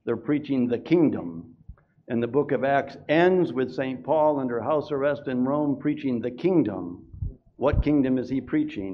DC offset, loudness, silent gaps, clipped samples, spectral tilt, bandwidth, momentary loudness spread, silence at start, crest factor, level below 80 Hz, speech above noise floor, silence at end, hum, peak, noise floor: under 0.1%; -25 LUFS; none; under 0.1%; -9 dB/octave; 6.4 kHz; 11 LU; 0.05 s; 16 dB; -42 dBFS; 25 dB; 0 s; none; -8 dBFS; -49 dBFS